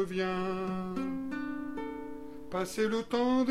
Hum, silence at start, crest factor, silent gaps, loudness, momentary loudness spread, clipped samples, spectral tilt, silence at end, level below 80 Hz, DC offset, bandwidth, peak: none; 0 s; 14 dB; none; -34 LUFS; 11 LU; under 0.1%; -6 dB/octave; 0 s; -58 dBFS; 0.4%; 15 kHz; -18 dBFS